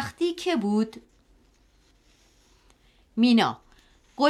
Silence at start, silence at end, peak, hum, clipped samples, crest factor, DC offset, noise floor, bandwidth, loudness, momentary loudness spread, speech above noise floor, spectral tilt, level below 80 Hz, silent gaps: 0 s; 0 s; -6 dBFS; none; under 0.1%; 20 dB; under 0.1%; -61 dBFS; 12.5 kHz; -25 LUFS; 18 LU; 38 dB; -5.5 dB/octave; -62 dBFS; none